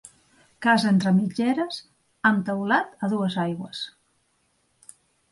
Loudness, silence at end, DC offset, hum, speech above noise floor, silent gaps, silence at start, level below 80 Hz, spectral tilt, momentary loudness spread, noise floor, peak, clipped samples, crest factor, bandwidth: -24 LUFS; 1.4 s; under 0.1%; none; 46 dB; none; 0.6 s; -68 dBFS; -6 dB/octave; 13 LU; -69 dBFS; -6 dBFS; under 0.1%; 20 dB; 11.5 kHz